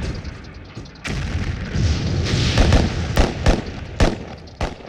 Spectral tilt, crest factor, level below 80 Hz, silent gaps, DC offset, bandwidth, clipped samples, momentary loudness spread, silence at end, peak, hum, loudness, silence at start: -5.5 dB/octave; 16 dB; -24 dBFS; none; under 0.1%; over 20 kHz; under 0.1%; 18 LU; 0 s; -4 dBFS; none; -21 LUFS; 0 s